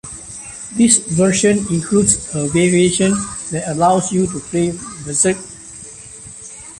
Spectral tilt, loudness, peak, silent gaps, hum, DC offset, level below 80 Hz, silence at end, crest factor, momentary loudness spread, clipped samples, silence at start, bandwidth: -4.5 dB/octave; -15 LUFS; 0 dBFS; none; none; under 0.1%; -44 dBFS; 0 s; 18 dB; 19 LU; under 0.1%; 0.05 s; 11.5 kHz